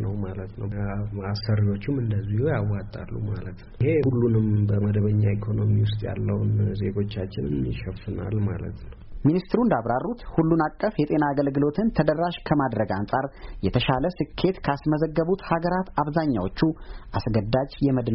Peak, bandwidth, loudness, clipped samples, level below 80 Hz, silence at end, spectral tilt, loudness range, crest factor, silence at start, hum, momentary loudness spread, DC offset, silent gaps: -8 dBFS; 5.8 kHz; -25 LUFS; under 0.1%; -42 dBFS; 0 s; -7 dB/octave; 4 LU; 16 dB; 0 s; none; 9 LU; under 0.1%; none